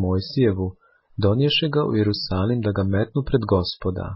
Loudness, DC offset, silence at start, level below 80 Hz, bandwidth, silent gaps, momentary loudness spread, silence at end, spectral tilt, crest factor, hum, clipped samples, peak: -22 LUFS; under 0.1%; 0 s; -38 dBFS; 5.8 kHz; none; 8 LU; 0 s; -10.5 dB/octave; 14 dB; none; under 0.1%; -6 dBFS